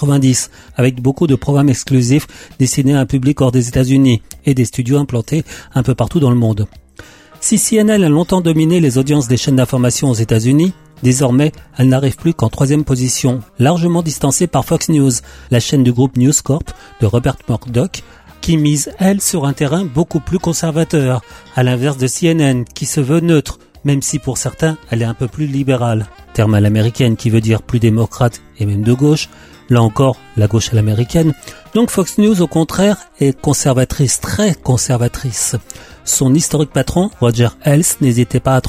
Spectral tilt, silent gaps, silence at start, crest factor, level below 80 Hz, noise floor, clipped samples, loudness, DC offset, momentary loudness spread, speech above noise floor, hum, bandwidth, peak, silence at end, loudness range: -5.5 dB/octave; none; 0 s; 12 dB; -36 dBFS; -39 dBFS; under 0.1%; -14 LUFS; under 0.1%; 6 LU; 26 dB; none; 16 kHz; 0 dBFS; 0 s; 3 LU